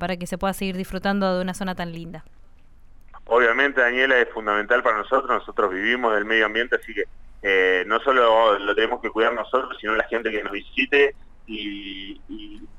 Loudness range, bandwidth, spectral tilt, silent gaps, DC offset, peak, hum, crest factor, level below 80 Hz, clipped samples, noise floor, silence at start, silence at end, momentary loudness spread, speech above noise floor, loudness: 4 LU; 15.5 kHz; -5 dB/octave; none; under 0.1%; -6 dBFS; none; 16 dB; -46 dBFS; under 0.1%; -46 dBFS; 0 s; 0.05 s; 14 LU; 24 dB; -21 LUFS